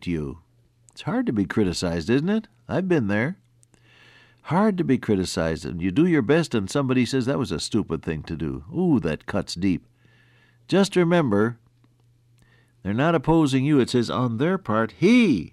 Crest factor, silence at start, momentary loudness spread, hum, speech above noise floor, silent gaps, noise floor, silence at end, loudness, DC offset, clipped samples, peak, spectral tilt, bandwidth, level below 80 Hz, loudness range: 14 dB; 0 s; 10 LU; none; 37 dB; none; -59 dBFS; 0.05 s; -23 LUFS; under 0.1%; under 0.1%; -8 dBFS; -6.5 dB/octave; 13 kHz; -48 dBFS; 3 LU